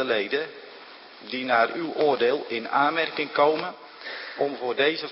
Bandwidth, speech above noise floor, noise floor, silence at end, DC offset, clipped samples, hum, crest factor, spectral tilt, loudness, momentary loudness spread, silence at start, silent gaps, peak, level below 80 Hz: 5.8 kHz; 21 dB; -45 dBFS; 0 s; under 0.1%; under 0.1%; none; 18 dB; -8 dB/octave; -25 LUFS; 18 LU; 0 s; none; -8 dBFS; -78 dBFS